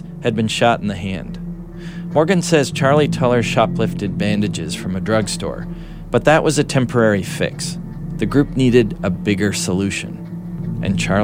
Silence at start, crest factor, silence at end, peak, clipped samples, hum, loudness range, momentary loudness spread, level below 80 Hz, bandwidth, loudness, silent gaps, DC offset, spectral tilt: 0 s; 18 dB; 0 s; 0 dBFS; under 0.1%; none; 2 LU; 14 LU; -38 dBFS; 16 kHz; -18 LUFS; none; under 0.1%; -5.5 dB/octave